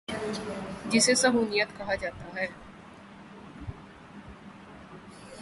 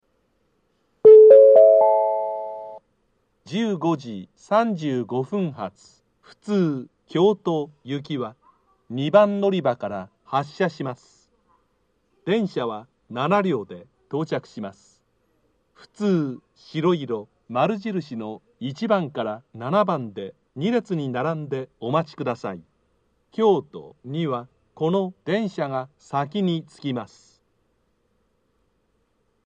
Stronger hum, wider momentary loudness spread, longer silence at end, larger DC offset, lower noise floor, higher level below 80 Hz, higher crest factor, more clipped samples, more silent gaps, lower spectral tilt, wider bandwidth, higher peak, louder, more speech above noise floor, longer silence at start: neither; first, 25 LU vs 18 LU; second, 0 s vs 2.4 s; neither; second, -49 dBFS vs -69 dBFS; first, -56 dBFS vs -70 dBFS; about the same, 20 dB vs 22 dB; neither; neither; second, -2.5 dB/octave vs -7.5 dB/octave; first, 11.5 kHz vs 7.8 kHz; second, -10 dBFS vs 0 dBFS; second, -27 LUFS vs -21 LUFS; second, 22 dB vs 45 dB; second, 0.1 s vs 1.05 s